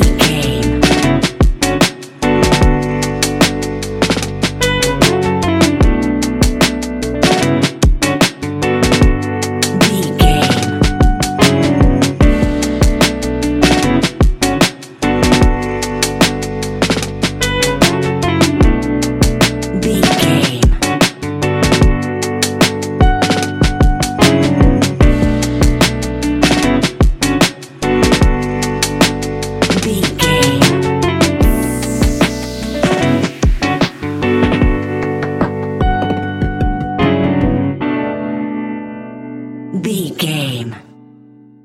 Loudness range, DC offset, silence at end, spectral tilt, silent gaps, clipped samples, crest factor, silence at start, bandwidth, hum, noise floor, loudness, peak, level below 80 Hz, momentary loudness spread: 4 LU; under 0.1%; 0.85 s; -5 dB/octave; none; under 0.1%; 12 dB; 0 s; 17 kHz; none; -41 dBFS; -14 LUFS; 0 dBFS; -20 dBFS; 7 LU